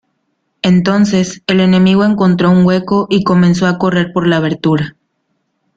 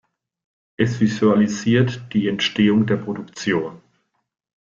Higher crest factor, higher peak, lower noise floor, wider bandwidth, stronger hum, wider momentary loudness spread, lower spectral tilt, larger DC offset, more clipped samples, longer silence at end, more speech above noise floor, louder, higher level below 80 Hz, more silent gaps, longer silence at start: second, 10 dB vs 16 dB; about the same, -2 dBFS vs -4 dBFS; about the same, -66 dBFS vs -68 dBFS; about the same, 7.8 kHz vs 7.4 kHz; neither; about the same, 5 LU vs 7 LU; about the same, -7 dB/octave vs -6 dB/octave; neither; neither; about the same, 0.85 s vs 0.9 s; first, 55 dB vs 49 dB; first, -12 LUFS vs -20 LUFS; first, -46 dBFS vs -56 dBFS; neither; second, 0.65 s vs 0.8 s